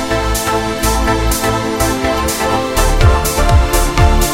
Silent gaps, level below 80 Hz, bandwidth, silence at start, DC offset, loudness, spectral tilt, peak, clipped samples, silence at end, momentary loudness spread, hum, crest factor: none; -16 dBFS; 16.5 kHz; 0 s; under 0.1%; -14 LUFS; -4.5 dB/octave; 0 dBFS; under 0.1%; 0 s; 3 LU; none; 12 dB